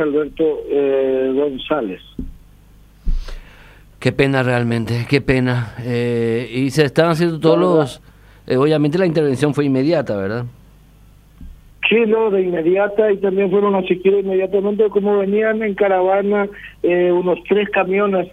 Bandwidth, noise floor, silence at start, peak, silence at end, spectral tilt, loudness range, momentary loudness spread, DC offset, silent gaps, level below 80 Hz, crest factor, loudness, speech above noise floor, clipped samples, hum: 13 kHz; -46 dBFS; 0 s; 0 dBFS; 0.05 s; -7 dB/octave; 5 LU; 9 LU; under 0.1%; none; -36 dBFS; 16 dB; -17 LUFS; 30 dB; under 0.1%; 50 Hz at -45 dBFS